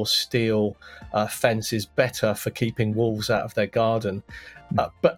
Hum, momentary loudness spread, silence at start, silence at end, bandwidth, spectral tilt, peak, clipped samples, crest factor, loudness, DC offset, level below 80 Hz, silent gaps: none; 7 LU; 0 s; 0 s; 17.5 kHz; -5 dB/octave; -4 dBFS; under 0.1%; 20 dB; -24 LUFS; under 0.1%; -54 dBFS; none